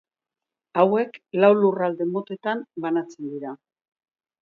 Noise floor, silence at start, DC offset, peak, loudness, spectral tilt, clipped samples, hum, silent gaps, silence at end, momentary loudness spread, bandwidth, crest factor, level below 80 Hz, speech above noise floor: -89 dBFS; 0.75 s; under 0.1%; -4 dBFS; -23 LUFS; -8 dB/octave; under 0.1%; none; none; 0.85 s; 15 LU; 7 kHz; 20 dB; -76 dBFS; 66 dB